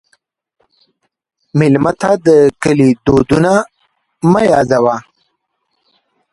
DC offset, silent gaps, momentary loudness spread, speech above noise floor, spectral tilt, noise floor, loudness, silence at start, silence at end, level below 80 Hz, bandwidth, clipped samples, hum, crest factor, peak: under 0.1%; none; 7 LU; 58 dB; -7 dB/octave; -69 dBFS; -12 LUFS; 1.55 s; 1.3 s; -42 dBFS; 11.5 kHz; under 0.1%; none; 14 dB; 0 dBFS